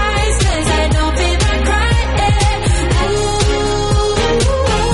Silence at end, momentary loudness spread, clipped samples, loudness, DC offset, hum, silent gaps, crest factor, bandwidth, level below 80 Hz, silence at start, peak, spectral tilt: 0 s; 1 LU; under 0.1%; -14 LUFS; under 0.1%; none; none; 10 dB; 11.5 kHz; -18 dBFS; 0 s; -2 dBFS; -4.5 dB/octave